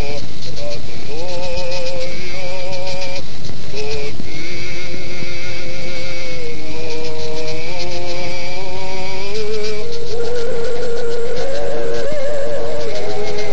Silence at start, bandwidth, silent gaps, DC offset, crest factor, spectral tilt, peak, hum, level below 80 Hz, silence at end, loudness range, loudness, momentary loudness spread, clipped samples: 0 s; 8 kHz; none; 50%; 14 dB; -4.5 dB/octave; -4 dBFS; none; -40 dBFS; 0 s; 4 LU; -25 LUFS; 6 LU; under 0.1%